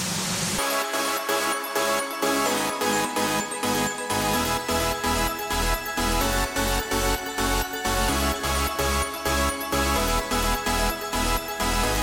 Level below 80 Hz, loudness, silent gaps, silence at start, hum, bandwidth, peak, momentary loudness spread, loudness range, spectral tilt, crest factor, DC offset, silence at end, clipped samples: -34 dBFS; -24 LUFS; none; 0 s; none; 17 kHz; -10 dBFS; 2 LU; 0 LU; -3 dB/octave; 16 dB; under 0.1%; 0 s; under 0.1%